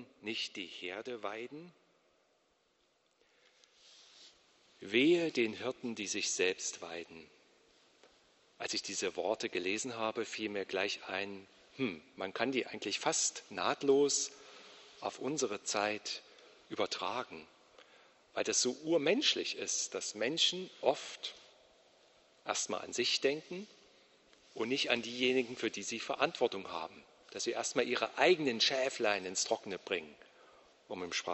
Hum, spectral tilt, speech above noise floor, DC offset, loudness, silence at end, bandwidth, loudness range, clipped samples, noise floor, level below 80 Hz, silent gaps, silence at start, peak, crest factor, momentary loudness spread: none; -2 dB/octave; 39 dB; under 0.1%; -35 LUFS; 0 s; 8.2 kHz; 6 LU; under 0.1%; -75 dBFS; -80 dBFS; none; 0 s; -12 dBFS; 24 dB; 15 LU